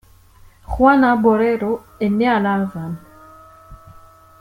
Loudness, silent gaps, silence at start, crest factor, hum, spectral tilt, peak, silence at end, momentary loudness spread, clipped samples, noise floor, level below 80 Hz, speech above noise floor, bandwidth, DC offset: -17 LUFS; none; 0.7 s; 16 dB; none; -8 dB/octave; -2 dBFS; 0.65 s; 17 LU; under 0.1%; -47 dBFS; -40 dBFS; 31 dB; 16 kHz; under 0.1%